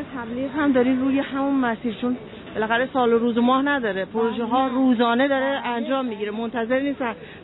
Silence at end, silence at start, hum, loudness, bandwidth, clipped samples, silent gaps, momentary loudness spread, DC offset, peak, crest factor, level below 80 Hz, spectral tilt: 0 s; 0 s; none; -22 LUFS; 4.1 kHz; under 0.1%; none; 9 LU; under 0.1%; -8 dBFS; 14 dB; -56 dBFS; -9 dB/octave